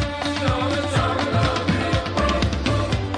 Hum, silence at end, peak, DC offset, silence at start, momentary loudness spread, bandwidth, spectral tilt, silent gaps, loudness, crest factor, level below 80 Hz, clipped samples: none; 0 s; -6 dBFS; under 0.1%; 0 s; 2 LU; 10.5 kHz; -5.5 dB/octave; none; -22 LUFS; 14 dB; -32 dBFS; under 0.1%